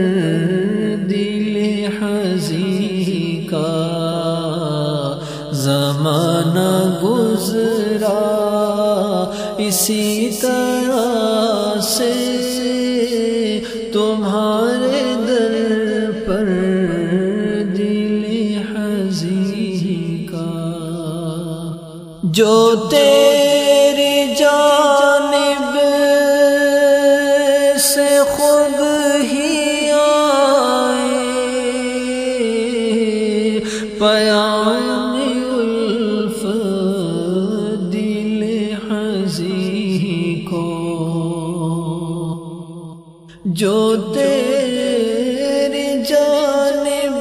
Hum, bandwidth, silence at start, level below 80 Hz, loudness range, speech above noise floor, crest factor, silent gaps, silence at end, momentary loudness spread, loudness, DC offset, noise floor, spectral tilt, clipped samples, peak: none; 15.5 kHz; 0 s; -50 dBFS; 7 LU; 26 dB; 16 dB; none; 0 s; 9 LU; -16 LUFS; under 0.1%; -40 dBFS; -4.5 dB/octave; under 0.1%; 0 dBFS